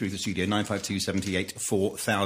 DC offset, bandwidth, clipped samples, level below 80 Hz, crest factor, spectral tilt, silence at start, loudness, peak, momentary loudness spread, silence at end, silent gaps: under 0.1%; 15.5 kHz; under 0.1%; -58 dBFS; 18 dB; -4 dB/octave; 0 s; -28 LUFS; -10 dBFS; 3 LU; 0 s; none